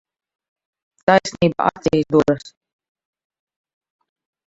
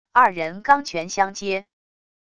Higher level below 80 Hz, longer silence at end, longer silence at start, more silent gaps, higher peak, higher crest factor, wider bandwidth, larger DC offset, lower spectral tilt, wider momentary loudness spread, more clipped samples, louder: first, -52 dBFS vs -60 dBFS; first, 2 s vs 0.75 s; first, 1.1 s vs 0.15 s; neither; about the same, 0 dBFS vs -2 dBFS; about the same, 22 dB vs 20 dB; second, 8 kHz vs 11 kHz; second, under 0.1% vs 0.5%; first, -6 dB/octave vs -3 dB/octave; second, 6 LU vs 9 LU; neither; first, -18 LUFS vs -21 LUFS